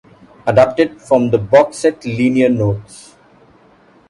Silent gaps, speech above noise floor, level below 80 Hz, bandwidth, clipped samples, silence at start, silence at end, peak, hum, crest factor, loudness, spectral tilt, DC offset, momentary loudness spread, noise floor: none; 35 dB; -46 dBFS; 11.5 kHz; under 0.1%; 0.45 s; 1.15 s; 0 dBFS; none; 16 dB; -14 LUFS; -7 dB/octave; under 0.1%; 7 LU; -48 dBFS